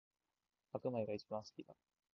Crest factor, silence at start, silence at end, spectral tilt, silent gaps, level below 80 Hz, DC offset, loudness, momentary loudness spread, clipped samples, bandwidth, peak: 20 dB; 0.75 s; 0.4 s; -6.5 dB/octave; none; -82 dBFS; under 0.1%; -45 LUFS; 16 LU; under 0.1%; 7 kHz; -26 dBFS